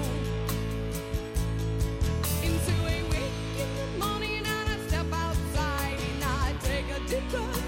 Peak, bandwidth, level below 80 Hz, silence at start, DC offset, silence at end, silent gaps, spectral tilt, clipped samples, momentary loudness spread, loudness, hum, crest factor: -16 dBFS; 17 kHz; -34 dBFS; 0 s; under 0.1%; 0 s; none; -5 dB/octave; under 0.1%; 4 LU; -30 LUFS; none; 12 dB